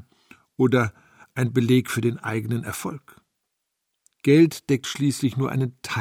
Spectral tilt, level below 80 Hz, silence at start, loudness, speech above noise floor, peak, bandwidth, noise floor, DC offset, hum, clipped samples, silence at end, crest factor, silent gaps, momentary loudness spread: -6 dB/octave; -62 dBFS; 0.6 s; -23 LUFS; 57 dB; -6 dBFS; 16.5 kHz; -79 dBFS; under 0.1%; none; under 0.1%; 0 s; 18 dB; none; 13 LU